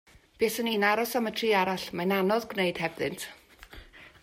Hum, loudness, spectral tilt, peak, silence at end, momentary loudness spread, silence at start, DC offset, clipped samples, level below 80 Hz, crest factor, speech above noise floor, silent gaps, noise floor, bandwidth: none; -28 LUFS; -4.5 dB/octave; -10 dBFS; 0.15 s; 13 LU; 0.4 s; under 0.1%; under 0.1%; -60 dBFS; 20 dB; 22 dB; none; -50 dBFS; 16 kHz